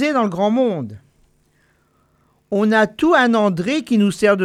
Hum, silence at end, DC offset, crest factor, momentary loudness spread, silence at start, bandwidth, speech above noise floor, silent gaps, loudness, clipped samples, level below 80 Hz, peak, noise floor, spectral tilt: none; 0 s; under 0.1%; 16 dB; 8 LU; 0 s; 12.5 kHz; 44 dB; none; -17 LUFS; under 0.1%; -58 dBFS; -2 dBFS; -60 dBFS; -6 dB/octave